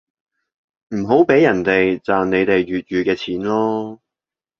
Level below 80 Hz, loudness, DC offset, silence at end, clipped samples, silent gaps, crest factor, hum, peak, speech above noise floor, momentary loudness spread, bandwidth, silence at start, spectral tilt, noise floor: -52 dBFS; -17 LUFS; under 0.1%; 0.65 s; under 0.1%; none; 18 dB; none; -2 dBFS; 72 dB; 11 LU; 7 kHz; 0.9 s; -7 dB/octave; -89 dBFS